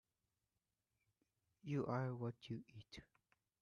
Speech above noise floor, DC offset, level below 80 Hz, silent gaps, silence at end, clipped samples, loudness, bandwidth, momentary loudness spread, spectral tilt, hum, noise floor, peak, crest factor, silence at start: over 44 dB; under 0.1%; -78 dBFS; none; 0.55 s; under 0.1%; -46 LUFS; 9.6 kHz; 17 LU; -8 dB/octave; none; under -90 dBFS; -32 dBFS; 18 dB; 1.65 s